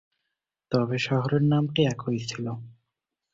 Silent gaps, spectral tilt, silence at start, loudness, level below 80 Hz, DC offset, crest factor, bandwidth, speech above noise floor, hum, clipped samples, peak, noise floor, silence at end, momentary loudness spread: none; -6.5 dB/octave; 0.7 s; -26 LUFS; -60 dBFS; under 0.1%; 18 dB; 7.8 kHz; 59 dB; none; under 0.1%; -8 dBFS; -84 dBFS; 0.6 s; 11 LU